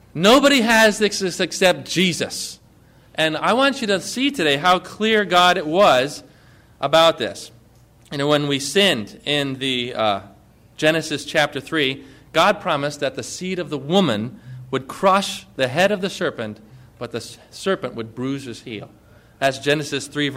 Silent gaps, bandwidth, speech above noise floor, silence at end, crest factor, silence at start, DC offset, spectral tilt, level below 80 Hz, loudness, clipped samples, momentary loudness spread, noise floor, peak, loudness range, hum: none; 16 kHz; 31 dB; 0 s; 16 dB; 0.15 s; under 0.1%; -3.5 dB/octave; -56 dBFS; -19 LUFS; under 0.1%; 16 LU; -51 dBFS; -4 dBFS; 7 LU; none